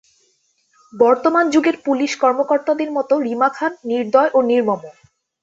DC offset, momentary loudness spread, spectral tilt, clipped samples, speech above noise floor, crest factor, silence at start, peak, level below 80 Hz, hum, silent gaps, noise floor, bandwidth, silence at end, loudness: under 0.1%; 7 LU; -4.5 dB/octave; under 0.1%; 46 dB; 16 dB; 0.95 s; -2 dBFS; -66 dBFS; none; none; -63 dBFS; 7.8 kHz; 0.5 s; -17 LUFS